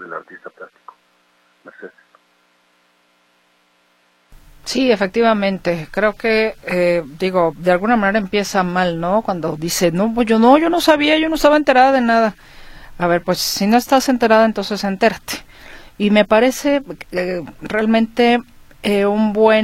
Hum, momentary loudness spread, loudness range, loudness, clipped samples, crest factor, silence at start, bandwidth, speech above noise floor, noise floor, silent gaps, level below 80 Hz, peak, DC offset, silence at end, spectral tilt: 60 Hz at -45 dBFS; 10 LU; 6 LU; -16 LUFS; under 0.1%; 16 dB; 0 s; 16.5 kHz; 43 dB; -58 dBFS; none; -44 dBFS; 0 dBFS; under 0.1%; 0 s; -4.5 dB/octave